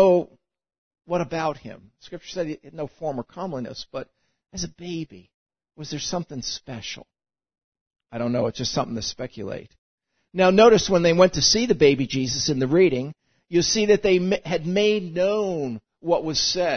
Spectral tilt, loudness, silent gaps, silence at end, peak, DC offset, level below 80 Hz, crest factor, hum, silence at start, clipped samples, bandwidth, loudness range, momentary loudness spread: -4 dB/octave; -22 LUFS; 0.78-0.91 s, 5.34-5.46 s, 7.64-7.72 s, 7.81-7.91 s, 9.78-9.98 s; 0 s; -2 dBFS; under 0.1%; -52 dBFS; 20 dB; none; 0 s; under 0.1%; 6.6 kHz; 15 LU; 18 LU